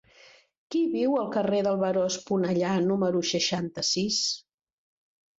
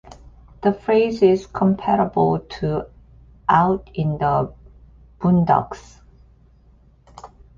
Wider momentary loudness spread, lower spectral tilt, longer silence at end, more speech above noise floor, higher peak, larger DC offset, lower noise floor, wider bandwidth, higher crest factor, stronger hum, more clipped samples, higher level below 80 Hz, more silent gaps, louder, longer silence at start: second, 3 LU vs 11 LU; second, -4 dB/octave vs -8.5 dB/octave; first, 1 s vs 0.3 s; second, 30 dB vs 34 dB; second, -12 dBFS vs -4 dBFS; neither; first, -56 dBFS vs -52 dBFS; about the same, 8 kHz vs 7.4 kHz; about the same, 16 dB vs 18 dB; neither; neither; second, -68 dBFS vs -46 dBFS; neither; second, -26 LUFS vs -20 LUFS; first, 0.7 s vs 0.1 s